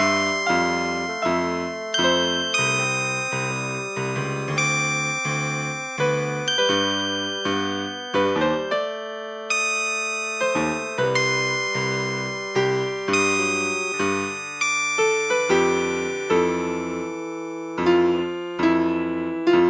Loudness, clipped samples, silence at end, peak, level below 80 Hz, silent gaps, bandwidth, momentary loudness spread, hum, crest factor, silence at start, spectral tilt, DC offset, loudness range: -22 LUFS; under 0.1%; 0 s; -8 dBFS; -54 dBFS; none; 8 kHz; 7 LU; none; 16 dB; 0 s; -3.5 dB/octave; under 0.1%; 2 LU